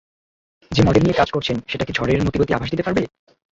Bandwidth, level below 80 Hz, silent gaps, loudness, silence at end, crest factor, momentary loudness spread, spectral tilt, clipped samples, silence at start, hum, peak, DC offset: 7.8 kHz; -38 dBFS; none; -19 LUFS; 0.55 s; 18 dB; 8 LU; -6.5 dB/octave; under 0.1%; 0.7 s; none; -2 dBFS; under 0.1%